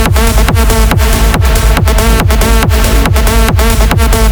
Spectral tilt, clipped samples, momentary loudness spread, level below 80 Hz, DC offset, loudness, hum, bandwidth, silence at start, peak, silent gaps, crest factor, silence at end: -4.5 dB/octave; under 0.1%; 0 LU; -8 dBFS; under 0.1%; -9 LUFS; none; over 20 kHz; 0 s; 0 dBFS; none; 6 dB; 0 s